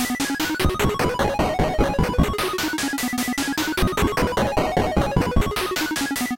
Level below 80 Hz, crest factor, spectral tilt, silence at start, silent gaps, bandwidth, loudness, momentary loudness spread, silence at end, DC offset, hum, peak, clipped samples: -30 dBFS; 14 dB; -4.5 dB/octave; 0 s; none; 17 kHz; -22 LUFS; 2 LU; 0 s; under 0.1%; none; -6 dBFS; under 0.1%